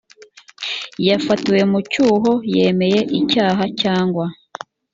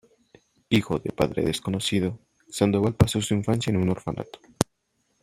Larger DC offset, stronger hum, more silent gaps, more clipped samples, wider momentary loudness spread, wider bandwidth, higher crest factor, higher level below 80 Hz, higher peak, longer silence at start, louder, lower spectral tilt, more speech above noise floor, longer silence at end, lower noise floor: neither; neither; neither; neither; about the same, 11 LU vs 11 LU; second, 7.6 kHz vs 15.5 kHz; second, 14 dB vs 26 dB; second, -56 dBFS vs -46 dBFS; about the same, -2 dBFS vs 0 dBFS; about the same, 0.6 s vs 0.7 s; first, -17 LUFS vs -25 LUFS; about the same, -6 dB/octave vs -5.5 dB/octave; second, 29 dB vs 48 dB; about the same, 0.6 s vs 0.6 s; second, -45 dBFS vs -72 dBFS